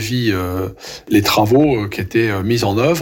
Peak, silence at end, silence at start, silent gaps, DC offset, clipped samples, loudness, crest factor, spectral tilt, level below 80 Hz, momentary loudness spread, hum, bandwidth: -4 dBFS; 0 s; 0 s; none; under 0.1%; under 0.1%; -16 LUFS; 12 dB; -5.5 dB/octave; -44 dBFS; 10 LU; none; 17 kHz